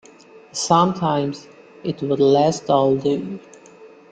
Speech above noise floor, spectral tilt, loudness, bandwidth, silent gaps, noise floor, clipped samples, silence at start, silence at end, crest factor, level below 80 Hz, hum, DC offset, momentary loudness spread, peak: 28 dB; -5.5 dB/octave; -19 LUFS; 9.2 kHz; none; -46 dBFS; under 0.1%; 0.35 s; 0.25 s; 18 dB; -58 dBFS; none; under 0.1%; 15 LU; -2 dBFS